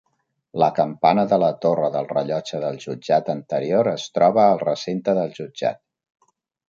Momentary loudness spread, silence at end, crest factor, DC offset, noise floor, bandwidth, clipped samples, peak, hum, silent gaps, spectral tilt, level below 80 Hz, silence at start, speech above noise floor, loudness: 10 LU; 0.95 s; 18 dB; under 0.1%; -71 dBFS; 7.6 kHz; under 0.1%; -4 dBFS; none; none; -6.5 dB/octave; -66 dBFS; 0.55 s; 51 dB; -21 LUFS